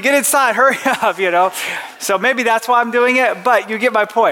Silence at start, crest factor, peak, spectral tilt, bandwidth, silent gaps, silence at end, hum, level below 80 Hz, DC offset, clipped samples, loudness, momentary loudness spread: 0 s; 12 dB; -2 dBFS; -2 dB/octave; 17.5 kHz; none; 0 s; none; -72 dBFS; under 0.1%; under 0.1%; -14 LUFS; 5 LU